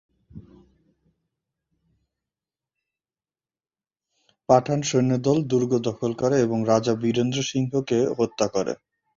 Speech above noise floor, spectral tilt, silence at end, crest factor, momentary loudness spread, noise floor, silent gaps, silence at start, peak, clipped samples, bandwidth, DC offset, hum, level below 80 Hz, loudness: over 68 dB; -6 dB/octave; 0.45 s; 22 dB; 6 LU; under -90 dBFS; none; 0.35 s; -4 dBFS; under 0.1%; 7.6 kHz; under 0.1%; none; -60 dBFS; -23 LUFS